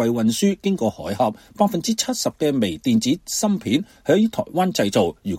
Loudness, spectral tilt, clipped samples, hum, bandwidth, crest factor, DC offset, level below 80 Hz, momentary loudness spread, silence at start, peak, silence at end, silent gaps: -21 LUFS; -5 dB/octave; under 0.1%; none; 16.5 kHz; 18 dB; under 0.1%; -54 dBFS; 4 LU; 0 s; -2 dBFS; 0 s; none